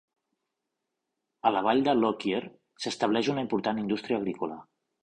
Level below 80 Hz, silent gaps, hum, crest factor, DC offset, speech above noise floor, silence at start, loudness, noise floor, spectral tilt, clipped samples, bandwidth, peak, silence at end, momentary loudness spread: -68 dBFS; none; none; 22 dB; under 0.1%; 57 dB; 1.45 s; -28 LUFS; -84 dBFS; -5.5 dB/octave; under 0.1%; 10.5 kHz; -8 dBFS; 0.4 s; 12 LU